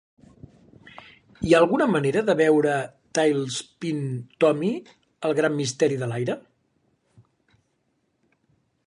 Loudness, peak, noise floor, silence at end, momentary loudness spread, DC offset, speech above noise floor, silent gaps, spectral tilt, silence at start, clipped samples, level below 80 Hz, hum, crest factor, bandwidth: -23 LUFS; -4 dBFS; -71 dBFS; 2.5 s; 11 LU; under 0.1%; 49 dB; none; -5.5 dB/octave; 0.85 s; under 0.1%; -58 dBFS; none; 20 dB; 11 kHz